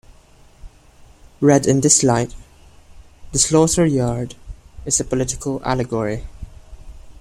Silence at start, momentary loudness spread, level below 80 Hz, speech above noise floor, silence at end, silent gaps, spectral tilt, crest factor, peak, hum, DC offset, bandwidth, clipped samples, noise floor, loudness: 0.65 s; 16 LU; -40 dBFS; 31 dB; 0.1 s; none; -4.5 dB/octave; 20 dB; 0 dBFS; none; under 0.1%; 15.5 kHz; under 0.1%; -48 dBFS; -17 LUFS